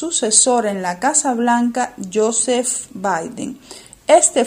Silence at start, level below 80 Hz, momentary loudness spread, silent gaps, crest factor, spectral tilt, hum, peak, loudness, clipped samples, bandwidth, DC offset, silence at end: 0 s; -58 dBFS; 16 LU; none; 18 dB; -2 dB/octave; none; 0 dBFS; -16 LUFS; under 0.1%; 16 kHz; under 0.1%; 0 s